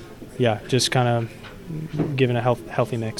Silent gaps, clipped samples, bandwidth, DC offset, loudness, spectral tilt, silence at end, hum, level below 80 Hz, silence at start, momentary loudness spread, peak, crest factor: none; under 0.1%; 14.5 kHz; under 0.1%; -22 LUFS; -5 dB/octave; 0 s; none; -48 dBFS; 0 s; 14 LU; -6 dBFS; 18 dB